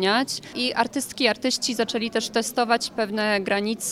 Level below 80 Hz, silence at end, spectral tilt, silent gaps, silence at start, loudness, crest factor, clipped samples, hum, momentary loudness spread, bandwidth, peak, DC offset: -62 dBFS; 0 s; -2.5 dB/octave; none; 0 s; -24 LUFS; 20 dB; under 0.1%; none; 3 LU; 16 kHz; -4 dBFS; under 0.1%